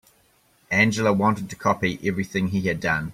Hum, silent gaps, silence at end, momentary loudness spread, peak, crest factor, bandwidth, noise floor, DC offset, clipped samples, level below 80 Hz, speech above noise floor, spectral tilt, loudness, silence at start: none; none; 0 s; 6 LU; -6 dBFS; 18 dB; 15.5 kHz; -61 dBFS; under 0.1%; under 0.1%; -54 dBFS; 38 dB; -5.5 dB/octave; -23 LUFS; 0.7 s